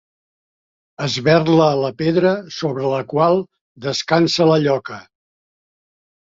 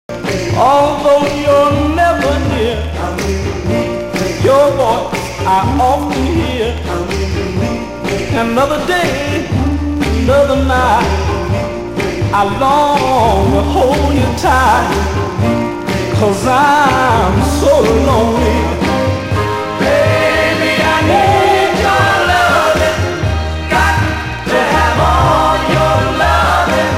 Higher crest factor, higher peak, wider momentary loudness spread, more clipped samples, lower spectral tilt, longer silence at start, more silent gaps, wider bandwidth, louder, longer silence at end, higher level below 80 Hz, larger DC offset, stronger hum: first, 18 dB vs 12 dB; about the same, -2 dBFS vs 0 dBFS; first, 12 LU vs 7 LU; neither; about the same, -6 dB/octave vs -5.5 dB/octave; first, 1 s vs 0.1 s; first, 3.61-3.75 s vs none; second, 7.8 kHz vs 16 kHz; second, -17 LUFS vs -12 LUFS; first, 1.4 s vs 0 s; second, -58 dBFS vs -24 dBFS; neither; neither